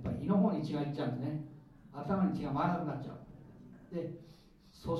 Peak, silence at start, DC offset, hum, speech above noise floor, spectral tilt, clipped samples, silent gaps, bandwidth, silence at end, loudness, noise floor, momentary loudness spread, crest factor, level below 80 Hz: -18 dBFS; 0 s; under 0.1%; none; 20 dB; -9 dB/octave; under 0.1%; none; 6.6 kHz; 0 s; -35 LUFS; -54 dBFS; 23 LU; 18 dB; -60 dBFS